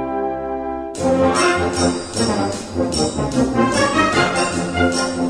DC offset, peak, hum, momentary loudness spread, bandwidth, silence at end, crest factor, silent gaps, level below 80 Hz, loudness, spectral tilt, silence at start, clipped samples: under 0.1%; -2 dBFS; none; 8 LU; 11 kHz; 0 s; 16 dB; none; -38 dBFS; -18 LUFS; -4.5 dB/octave; 0 s; under 0.1%